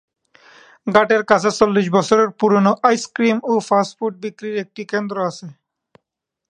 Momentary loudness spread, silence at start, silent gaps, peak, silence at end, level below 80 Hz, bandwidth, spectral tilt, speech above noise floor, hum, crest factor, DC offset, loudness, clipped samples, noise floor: 11 LU; 0.85 s; none; 0 dBFS; 1 s; -62 dBFS; 10 kHz; -5.5 dB/octave; 64 dB; none; 18 dB; under 0.1%; -17 LUFS; under 0.1%; -81 dBFS